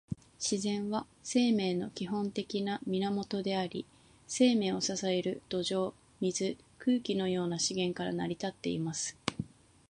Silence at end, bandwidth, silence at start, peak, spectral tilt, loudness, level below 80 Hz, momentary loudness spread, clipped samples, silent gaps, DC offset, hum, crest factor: 0.45 s; 11 kHz; 0.1 s; -10 dBFS; -4.5 dB/octave; -33 LUFS; -66 dBFS; 9 LU; under 0.1%; none; under 0.1%; none; 24 dB